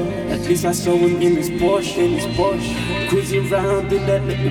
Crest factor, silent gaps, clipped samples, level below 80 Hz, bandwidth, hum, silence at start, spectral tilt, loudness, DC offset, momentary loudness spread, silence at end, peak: 14 dB; none; under 0.1%; -38 dBFS; 17 kHz; none; 0 s; -5.5 dB/octave; -19 LUFS; under 0.1%; 5 LU; 0 s; -4 dBFS